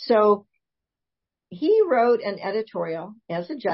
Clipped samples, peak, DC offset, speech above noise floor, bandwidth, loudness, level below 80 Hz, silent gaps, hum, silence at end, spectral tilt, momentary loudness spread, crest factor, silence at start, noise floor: under 0.1%; -8 dBFS; under 0.1%; 65 dB; 5.8 kHz; -23 LUFS; -74 dBFS; none; none; 0 s; -10 dB/octave; 13 LU; 16 dB; 0 s; -87 dBFS